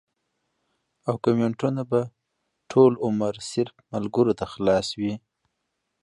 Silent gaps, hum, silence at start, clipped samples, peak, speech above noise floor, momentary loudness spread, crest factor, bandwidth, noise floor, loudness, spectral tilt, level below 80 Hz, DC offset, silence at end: none; none; 1.05 s; under 0.1%; -4 dBFS; 55 dB; 12 LU; 20 dB; 11 kHz; -78 dBFS; -24 LUFS; -6.5 dB/octave; -58 dBFS; under 0.1%; 0.85 s